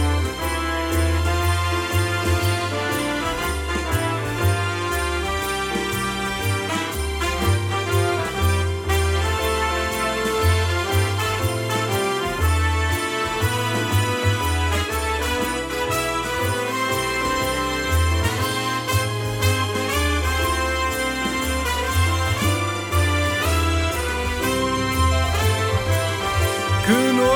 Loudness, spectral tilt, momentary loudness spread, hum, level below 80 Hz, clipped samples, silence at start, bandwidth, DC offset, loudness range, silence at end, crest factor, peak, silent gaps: -21 LUFS; -4.5 dB/octave; 3 LU; none; -34 dBFS; under 0.1%; 0 s; 18 kHz; under 0.1%; 2 LU; 0 s; 14 dB; -6 dBFS; none